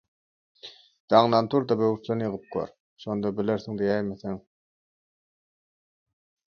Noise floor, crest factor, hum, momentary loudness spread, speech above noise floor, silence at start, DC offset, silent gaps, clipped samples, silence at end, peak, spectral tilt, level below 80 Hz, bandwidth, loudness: under -90 dBFS; 24 dB; none; 21 LU; over 65 dB; 0.65 s; under 0.1%; 1.00-1.08 s, 2.80-2.96 s; under 0.1%; 2.1 s; -4 dBFS; -7.5 dB/octave; -64 dBFS; 6.8 kHz; -26 LUFS